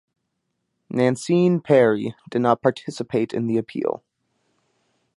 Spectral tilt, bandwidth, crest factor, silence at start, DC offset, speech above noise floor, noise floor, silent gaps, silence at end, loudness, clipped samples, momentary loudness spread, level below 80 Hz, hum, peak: -7 dB/octave; 11.5 kHz; 20 dB; 0.9 s; under 0.1%; 56 dB; -76 dBFS; none; 1.2 s; -21 LUFS; under 0.1%; 11 LU; -66 dBFS; none; -2 dBFS